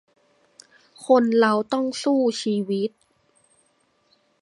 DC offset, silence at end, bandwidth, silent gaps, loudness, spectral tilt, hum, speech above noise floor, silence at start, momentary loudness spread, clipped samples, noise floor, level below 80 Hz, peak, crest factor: under 0.1%; 1.55 s; 11.5 kHz; none; -21 LUFS; -5 dB/octave; none; 45 dB; 1 s; 9 LU; under 0.1%; -66 dBFS; -76 dBFS; -4 dBFS; 20 dB